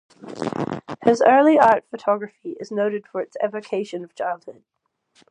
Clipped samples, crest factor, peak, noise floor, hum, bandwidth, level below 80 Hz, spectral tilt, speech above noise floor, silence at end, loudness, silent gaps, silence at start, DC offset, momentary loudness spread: under 0.1%; 20 dB; -2 dBFS; -60 dBFS; none; 10 kHz; -66 dBFS; -6 dB/octave; 40 dB; 0.8 s; -21 LUFS; none; 0.25 s; under 0.1%; 17 LU